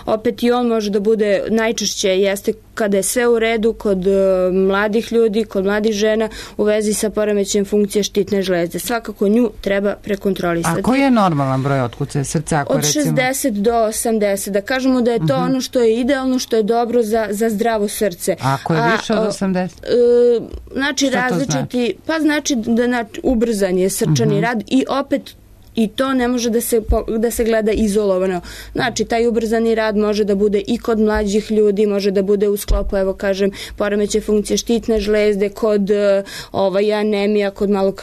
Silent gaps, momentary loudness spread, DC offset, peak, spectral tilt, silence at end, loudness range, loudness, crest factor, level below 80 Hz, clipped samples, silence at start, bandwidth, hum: none; 5 LU; under 0.1%; -4 dBFS; -5 dB/octave; 0 s; 2 LU; -17 LUFS; 12 dB; -36 dBFS; under 0.1%; 0 s; 13.5 kHz; none